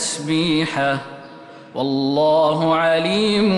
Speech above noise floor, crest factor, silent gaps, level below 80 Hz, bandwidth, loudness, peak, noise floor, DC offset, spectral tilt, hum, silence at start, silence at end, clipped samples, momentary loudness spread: 22 dB; 10 dB; none; -56 dBFS; 11.5 kHz; -18 LUFS; -8 dBFS; -40 dBFS; under 0.1%; -4.5 dB/octave; none; 0 s; 0 s; under 0.1%; 11 LU